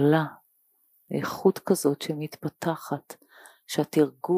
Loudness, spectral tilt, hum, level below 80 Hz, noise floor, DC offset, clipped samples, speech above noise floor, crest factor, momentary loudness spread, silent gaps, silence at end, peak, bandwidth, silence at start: -27 LUFS; -6 dB/octave; none; -74 dBFS; -67 dBFS; under 0.1%; under 0.1%; 42 dB; 18 dB; 11 LU; none; 0 s; -8 dBFS; 15.5 kHz; 0 s